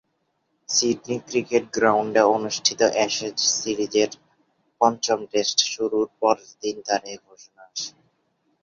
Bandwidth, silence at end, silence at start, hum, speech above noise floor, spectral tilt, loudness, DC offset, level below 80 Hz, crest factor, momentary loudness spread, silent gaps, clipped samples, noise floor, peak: 7.6 kHz; 0.75 s; 0.7 s; none; 50 dB; -2 dB/octave; -22 LUFS; under 0.1%; -66 dBFS; 22 dB; 12 LU; none; under 0.1%; -72 dBFS; -2 dBFS